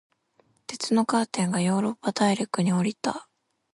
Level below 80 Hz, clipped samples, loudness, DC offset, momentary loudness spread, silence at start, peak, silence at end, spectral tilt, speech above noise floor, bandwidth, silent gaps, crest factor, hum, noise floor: -70 dBFS; under 0.1%; -25 LUFS; under 0.1%; 11 LU; 0.7 s; -10 dBFS; 0.5 s; -5 dB/octave; 41 dB; 11.5 kHz; none; 16 dB; none; -66 dBFS